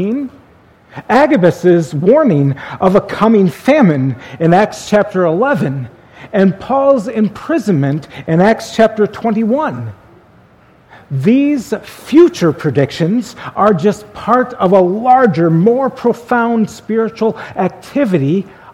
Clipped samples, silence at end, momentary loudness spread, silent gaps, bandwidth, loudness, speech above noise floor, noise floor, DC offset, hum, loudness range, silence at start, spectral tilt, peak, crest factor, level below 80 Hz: 0.1%; 0.05 s; 9 LU; none; 15.5 kHz; -13 LUFS; 34 dB; -46 dBFS; under 0.1%; none; 3 LU; 0 s; -7.5 dB/octave; 0 dBFS; 12 dB; -50 dBFS